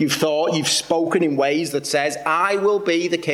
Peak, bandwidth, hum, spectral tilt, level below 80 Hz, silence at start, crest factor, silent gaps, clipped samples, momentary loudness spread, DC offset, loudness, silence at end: -6 dBFS; 16.5 kHz; none; -3.5 dB/octave; -66 dBFS; 0 s; 14 dB; none; under 0.1%; 3 LU; under 0.1%; -19 LUFS; 0 s